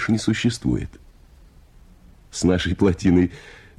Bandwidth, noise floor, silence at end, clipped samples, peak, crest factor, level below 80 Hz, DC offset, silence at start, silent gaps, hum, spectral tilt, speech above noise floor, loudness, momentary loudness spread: 12 kHz; -49 dBFS; 0.25 s; under 0.1%; -6 dBFS; 18 dB; -40 dBFS; under 0.1%; 0 s; none; none; -6 dB/octave; 29 dB; -21 LUFS; 15 LU